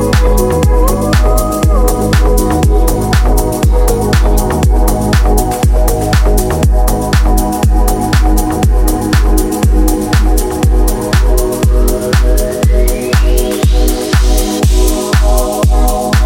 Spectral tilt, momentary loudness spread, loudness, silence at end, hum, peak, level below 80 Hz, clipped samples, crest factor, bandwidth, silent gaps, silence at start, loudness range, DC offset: -5.5 dB/octave; 2 LU; -12 LUFS; 0 s; none; 0 dBFS; -10 dBFS; under 0.1%; 8 dB; 17 kHz; none; 0 s; 1 LU; under 0.1%